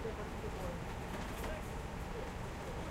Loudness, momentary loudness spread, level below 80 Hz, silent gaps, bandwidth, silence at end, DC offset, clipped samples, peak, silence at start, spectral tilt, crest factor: -43 LUFS; 2 LU; -48 dBFS; none; 16 kHz; 0 s; under 0.1%; under 0.1%; -30 dBFS; 0 s; -5.5 dB/octave; 14 dB